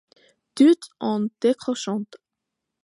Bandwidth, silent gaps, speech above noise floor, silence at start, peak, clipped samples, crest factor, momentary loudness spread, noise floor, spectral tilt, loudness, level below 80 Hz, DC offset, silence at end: 11.5 kHz; none; 62 dB; 0.55 s; -6 dBFS; under 0.1%; 18 dB; 15 LU; -83 dBFS; -5.5 dB/octave; -22 LUFS; -76 dBFS; under 0.1%; 0.8 s